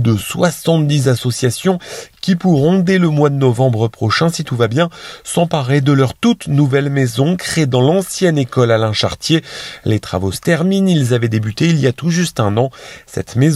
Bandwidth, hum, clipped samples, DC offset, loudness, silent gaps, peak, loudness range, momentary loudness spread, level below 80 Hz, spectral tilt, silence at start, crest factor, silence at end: 14 kHz; none; under 0.1%; under 0.1%; -15 LUFS; none; 0 dBFS; 1 LU; 7 LU; -48 dBFS; -6 dB/octave; 0 s; 14 dB; 0 s